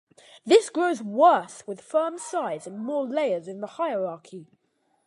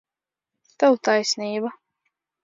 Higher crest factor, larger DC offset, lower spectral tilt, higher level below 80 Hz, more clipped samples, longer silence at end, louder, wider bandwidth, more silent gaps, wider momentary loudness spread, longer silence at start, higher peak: about the same, 20 dB vs 20 dB; neither; about the same, -4 dB/octave vs -3 dB/octave; about the same, -84 dBFS vs -80 dBFS; neither; about the same, 0.65 s vs 0.7 s; second, -25 LUFS vs -22 LUFS; first, 11.5 kHz vs 7.8 kHz; neither; first, 19 LU vs 10 LU; second, 0.45 s vs 0.8 s; about the same, -6 dBFS vs -6 dBFS